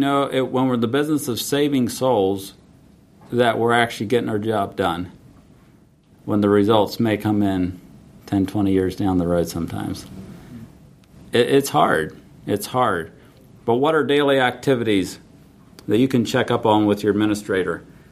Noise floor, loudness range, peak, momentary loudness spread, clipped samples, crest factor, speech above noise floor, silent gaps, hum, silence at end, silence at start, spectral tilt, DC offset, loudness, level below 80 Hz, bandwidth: -52 dBFS; 3 LU; -2 dBFS; 15 LU; under 0.1%; 20 dB; 33 dB; none; none; 0.3 s; 0 s; -5.5 dB/octave; under 0.1%; -20 LUFS; -52 dBFS; 15.5 kHz